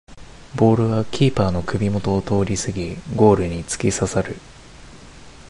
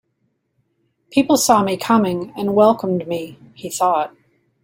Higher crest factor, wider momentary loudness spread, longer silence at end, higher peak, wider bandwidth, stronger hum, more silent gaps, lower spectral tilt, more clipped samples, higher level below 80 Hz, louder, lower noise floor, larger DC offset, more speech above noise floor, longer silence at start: about the same, 18 dB vs 18 dB; second, 11 LU vs 14 LU; second, 0 s vs 0.55 s; about the same, -2 dBFS vs -2 dBFS; second, 11.5 kHz vs 16.5 kHz; neither; neither; first, -6 dB/octave vs -4.5 dB/octave; neither; first, -38 dBFS vs -60 dBFS; about the same, -20 LUFS vs -18 LUFS; second, -42 dBFS vs -69 dBFS; neither; second, 23 dB vs 52 dB; second, 0.05 s vs 1.1 s